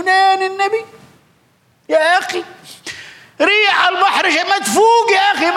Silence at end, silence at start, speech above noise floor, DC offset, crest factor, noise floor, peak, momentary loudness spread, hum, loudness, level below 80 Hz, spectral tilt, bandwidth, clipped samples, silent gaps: 0 s; 0 s; 42 dB; under 0.1%; 12 dB; -56 dBFS; -2 dBFS; 19 LU; none; -13 LUFS; -66 dBFS; -1.5 dB/octave; 16 kHz; under 0.1%; none